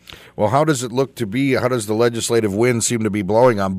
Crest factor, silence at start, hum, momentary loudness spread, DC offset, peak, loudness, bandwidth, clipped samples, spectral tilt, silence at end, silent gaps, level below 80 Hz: 16 dB; 0.1 s; none; 7 LU; under 0.1%; -2 dBFS; -18 LUFS; 16 kHz; under 0.1%; -5 dB/octave; 0 s; none; -54 dBFS